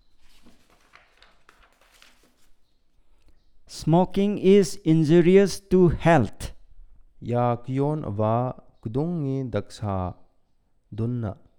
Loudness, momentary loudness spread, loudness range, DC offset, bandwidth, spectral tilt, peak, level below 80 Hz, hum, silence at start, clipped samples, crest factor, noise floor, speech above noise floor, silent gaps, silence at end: -23 LUFS; 14 LU; 9 LU; under 0.1%; 16.5 kHz; -7.5 dB/octave; -6 dBFS; -46 dBFS; none; 0.45 s; under 0.1%; 18 dB; -63 dBFS; 42 dB; none; 0.25 s